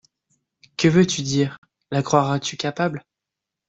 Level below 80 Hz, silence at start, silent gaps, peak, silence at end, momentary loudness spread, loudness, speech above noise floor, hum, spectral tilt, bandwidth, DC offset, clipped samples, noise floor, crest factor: -58 dBFS; 0.8 s; 1.58-1.62 s; -4 dBFS; 0.7 s; 10 LU; -21 LUFS; 65 dB; none; -5 dB/octave; 8.2 kHz; under 0.1%; under 0.1%; -85 dBFS; 20 dB